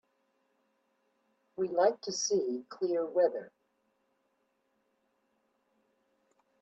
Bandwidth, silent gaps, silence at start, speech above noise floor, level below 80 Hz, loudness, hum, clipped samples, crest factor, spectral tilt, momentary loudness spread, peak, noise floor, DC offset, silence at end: 8.2 kHz; none; 1.6 s; 46 dB; -84 dBFS; -31 LUFS; none; under 0.1%; 22 dB; -3 dB/octave; 9 LU; -16 dBFS; -77 dBFS; under 0.1%; 3.15 s